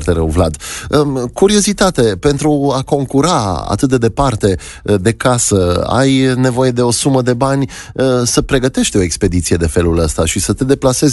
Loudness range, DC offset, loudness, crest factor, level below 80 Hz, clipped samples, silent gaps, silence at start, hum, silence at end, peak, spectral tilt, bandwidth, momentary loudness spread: 1 LU; under 0.1%; -13 LUFS; 12 dB; -28 dBFS; under 0.1%; none; 0 s; none; 0 s; 0 dBFS; -5 dB/octave; 12 kHz; 4 LU